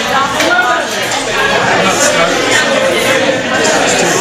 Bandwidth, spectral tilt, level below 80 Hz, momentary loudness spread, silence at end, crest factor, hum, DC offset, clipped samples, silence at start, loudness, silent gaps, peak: 16 kHz; -2 dB/octave; -42 dBFS; 3 LU; 0 s; 12 dB; none; under 0.1%; under 0.1%; 0 s; -10 LUFS; none; 0 dBFS